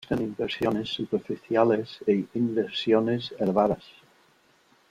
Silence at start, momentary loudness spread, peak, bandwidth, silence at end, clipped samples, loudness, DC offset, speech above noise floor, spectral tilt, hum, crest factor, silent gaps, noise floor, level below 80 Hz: 0 s; 7 LU; -6 dBFS; 13.5 kHz; 1.15 s; under 0.1%; -26 LUFS; under 0.1%; 36 dB; -7 dB/octave; none; 20 dB; none; -62 dBFS; -60 dBFS